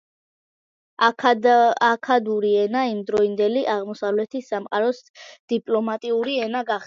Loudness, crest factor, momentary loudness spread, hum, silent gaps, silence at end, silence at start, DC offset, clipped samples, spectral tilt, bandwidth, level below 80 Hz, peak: -21 LUFS; 18 dB; 9 LU; none; 5.09-5.14 s, 5.39-5.48 s; 0 s; 1 s; under 0.1%; under 0.1%; -5 dB/octave; 7.4 kHz; -70 dBFS; -4 dBFS